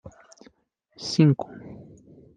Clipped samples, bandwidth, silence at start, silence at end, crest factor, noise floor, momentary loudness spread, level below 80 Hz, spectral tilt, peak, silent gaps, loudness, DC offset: under 0.1%; 9.4 kHz; 0.05 s; 0.6 s; 22 dB; -64 dBFS; 24 LU; -64 dBFS; -7 dB/octave; -6 dBFS; none; -23 LUFS; under 0.1%